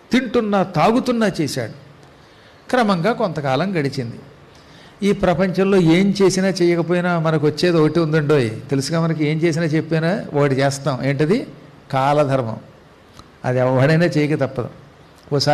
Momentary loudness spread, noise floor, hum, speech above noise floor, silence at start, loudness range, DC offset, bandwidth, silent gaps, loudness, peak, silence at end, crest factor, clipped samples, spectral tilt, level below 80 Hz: 9 LU; -46 dBFS; none; 29 dB; 0.1 s; 5 LU; under 0.1%; 13 kHz; none; -18 LUFS; -6 dBFS; 0 s; 12 dB; under 0.1%; -6.5 dB/octave; -50 dBFS